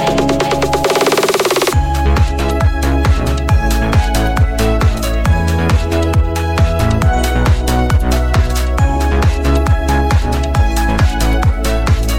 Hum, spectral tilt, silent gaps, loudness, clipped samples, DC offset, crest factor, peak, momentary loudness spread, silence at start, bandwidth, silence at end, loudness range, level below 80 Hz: none; -5.5 dB/octave; none; -14 LUFS; under 0.1%; 2%; 10 dB; -2 dBFS; 2 LU; 0 s; 17 kHz; 0 s; 1 LU; -16 dBFS